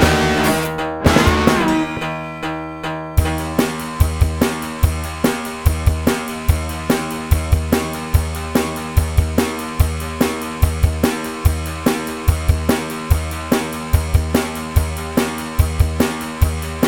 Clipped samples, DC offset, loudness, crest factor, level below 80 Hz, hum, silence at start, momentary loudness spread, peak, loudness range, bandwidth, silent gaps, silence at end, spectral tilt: under 0.1%; under 0.1%; -19 LUFS; 18 dB; -24 dBFS; none; 0 s; 5 LU; 0 dBFS; 2 LU; 19.5 kHz; none; 0 s; -5.5 dB/octave